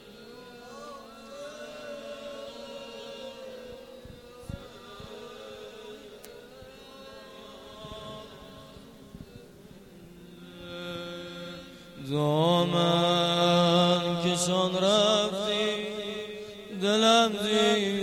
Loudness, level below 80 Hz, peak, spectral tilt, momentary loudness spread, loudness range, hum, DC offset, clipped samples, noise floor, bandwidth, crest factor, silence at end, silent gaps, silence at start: -25 LUFS; -60 dBFS; -10 dBFS; -4.5 dB/octave; 25 LU; 21 LU; none; under 0.1%; under 0.1%; -50 dBFS; 15.5 kHz; 20 dB; 0 s; none; 0 s